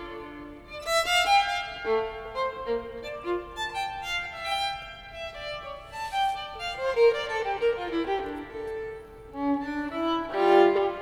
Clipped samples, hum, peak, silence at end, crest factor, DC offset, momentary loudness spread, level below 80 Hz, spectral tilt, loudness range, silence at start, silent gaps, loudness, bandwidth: under 0.1%; none; -8 dBFS; 0 s; 20 dB; under 0.1%; 16 LU; -52 dBFS; -3 dB/octave; 5 LU; 0 s; none; -27 LUFS; over 20 kHz